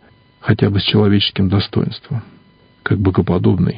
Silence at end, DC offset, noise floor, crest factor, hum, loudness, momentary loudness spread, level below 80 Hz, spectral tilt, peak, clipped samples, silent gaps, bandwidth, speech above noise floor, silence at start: 0 s; under 0.1%; -49 dBFS; 16 dB; none; -16 LUFS; 13 LU; -34 dBFS; -10.5 dB/octave; 0 dBFS; under 0.1%; none; 5.2 kHz; 34 dB; 0.45 s